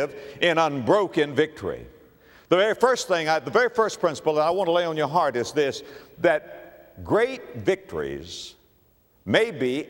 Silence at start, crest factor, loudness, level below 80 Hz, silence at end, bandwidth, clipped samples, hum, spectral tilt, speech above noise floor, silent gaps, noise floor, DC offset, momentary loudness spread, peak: 0 s; 20 dB; -23 LUFS; -58 dBFS; 0 s; 16.5 kHz; under 0.1%; none; -4.5 dB/octave; 38 dB; none; -61 dBFS; under 0.1%; 16 LU; -4 dBFS